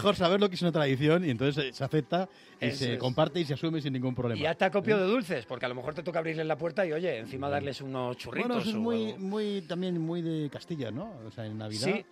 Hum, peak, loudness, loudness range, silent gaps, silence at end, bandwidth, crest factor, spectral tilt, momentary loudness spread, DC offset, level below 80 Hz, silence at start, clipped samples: none; -12 dBFS; -31 LUFS; 4 LU; none; 0.1 s; 14.5 kHz; 18 dB; -6.5 dB/octave; 10 LU; under 0.1%; -64 dBFS; 0 s; under 0.1%